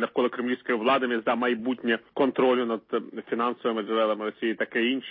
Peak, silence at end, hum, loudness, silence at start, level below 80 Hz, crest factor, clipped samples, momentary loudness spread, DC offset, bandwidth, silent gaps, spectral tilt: -10 dBFS; 0 s; none; -26 LUFS; 0 s; -78 dBFS; 16 dB; under 0.1%; 6 LU; under 0.1%; 4.8 kHz; none; -9 dB/octave